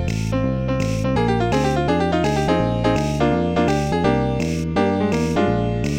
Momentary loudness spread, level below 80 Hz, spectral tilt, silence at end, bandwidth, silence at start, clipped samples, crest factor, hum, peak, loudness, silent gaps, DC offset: 3 LU; -32 dBFS; -6.5 dB/octave; 0 s; 16 kHz; 0 s; under 0.1%; 14 dB; none; -4 dBFS; -20 LUFS; none; 0.5%